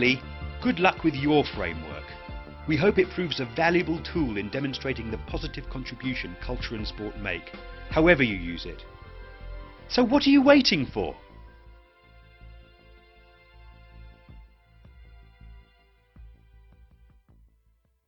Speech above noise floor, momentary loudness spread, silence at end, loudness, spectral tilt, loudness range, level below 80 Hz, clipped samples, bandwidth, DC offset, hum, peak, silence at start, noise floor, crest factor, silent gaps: 42 dB; 23 LU; 1.75 s; -25 LUFS; -6 dB/octave; 9 LU; -44 dBFS; under 0.1%; 6.4 kHz; under 0.1%; none; -4 dBFS; 0 s; -67 dBFS; 24 dB; none